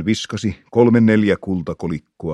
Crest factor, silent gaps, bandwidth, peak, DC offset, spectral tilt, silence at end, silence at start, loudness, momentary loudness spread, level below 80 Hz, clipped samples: 16 dB; none; 9.4 kHz; 0 dBFS; under 0.1%; -6.5 dB/octave; 0 s; 0 s; -18 LUFS; 13 LU; -48 dBFS; under 0.1%